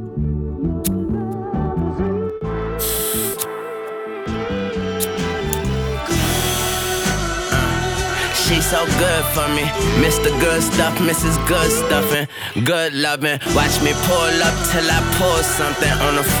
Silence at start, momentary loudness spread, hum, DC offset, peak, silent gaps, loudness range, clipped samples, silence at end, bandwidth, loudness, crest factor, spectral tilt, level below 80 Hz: 0 s; 8 LU; none; under 0.1%; -2 dBFS; none; 6 LU; under 0.1%; 0 s; over 20 kHz; -18 LUFS; 16 dB; -4 dB/octave; -30 dBFS